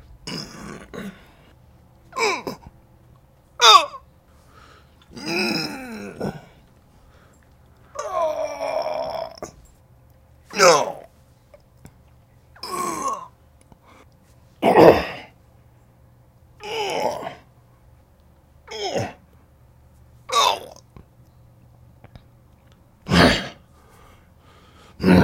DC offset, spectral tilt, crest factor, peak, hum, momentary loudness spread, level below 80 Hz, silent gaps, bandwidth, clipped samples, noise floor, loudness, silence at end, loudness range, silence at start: under 0.1%; -4 dB/octave; 24 dB; 0 dBFS; none; 24 LU; -48 dBFS; none; 16.5 kHz; under 0.1%; -54 dBFS; -20 LUFS; 0 s; 12 LU; 0.25 s